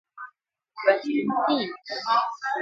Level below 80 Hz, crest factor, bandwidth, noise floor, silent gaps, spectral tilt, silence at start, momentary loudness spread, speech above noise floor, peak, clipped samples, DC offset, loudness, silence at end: -78 dBFS; 20 dB; 7.6 kHz; -61 dBFS; none; -5 dB/octave; 0.15 s; 20 LU; 36 dB; -8 dBFS; under 0.1%; under 0.1%; -25 LUFS; 0 s